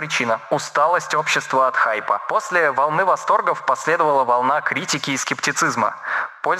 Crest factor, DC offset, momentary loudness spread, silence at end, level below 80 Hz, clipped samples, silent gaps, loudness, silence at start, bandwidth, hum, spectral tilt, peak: 14 dB; under 0.1%; 5 LU; 0 s; -78 dBFS; under 0.1%; none; -19 LUFS; 0 s; 15.5 kHz; none; -2.5 dB/octave; -6 dBFS